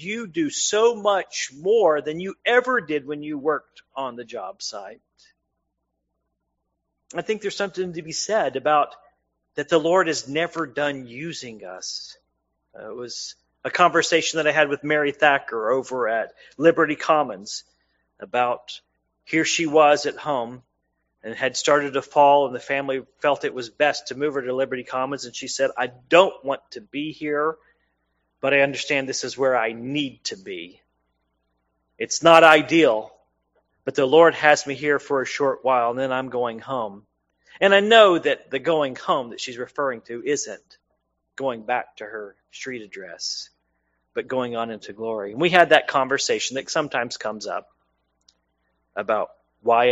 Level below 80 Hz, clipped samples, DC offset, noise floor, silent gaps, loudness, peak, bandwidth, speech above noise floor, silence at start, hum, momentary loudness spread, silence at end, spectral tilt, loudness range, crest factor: -68 dBFS; under 0.1%; under 0.1%; -77 dBFS; none; -21 LUFS; 0 dBFS; 8 kHz; 55 dB; 0 s; none; 17 LU; 0 s; -2 dB/octave; 11 LU; 22 dB